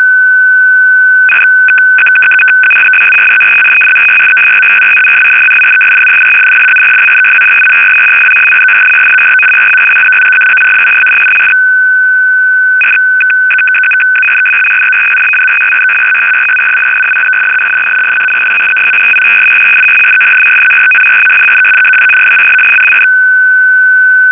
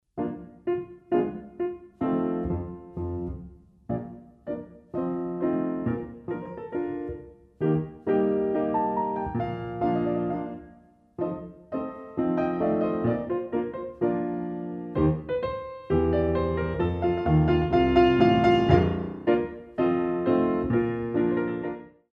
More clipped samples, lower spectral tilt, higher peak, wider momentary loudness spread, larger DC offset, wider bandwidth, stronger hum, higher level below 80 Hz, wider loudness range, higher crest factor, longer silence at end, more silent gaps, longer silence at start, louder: neither; second, -2.5 dB/octave vs -9.5 dB/octave; first, 0 dBFS vs -4 dBFS; second, 3 LU vs 13 LU; neither; second, 4 kHz vs 5.8 kHz; neither; second, -58 dBFS vs -44 dBFS; second, 3 LU vs 10 LU; second, 6 dB vs 22 dB; second, 0 s vs 0.25 s; neither; second, 0 s vs 0.15 s; first, -3 LUFS vs -27 LUFS